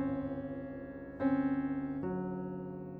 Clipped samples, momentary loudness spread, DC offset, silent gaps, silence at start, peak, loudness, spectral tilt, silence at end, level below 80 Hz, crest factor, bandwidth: under 0.1%; 11 LU; under 0.1%; none; 0 s; -22 dBFS; -37 LUFS; -11 dB/octave; 0 s; -60 dBFS; 16 dB; 4.2 kHz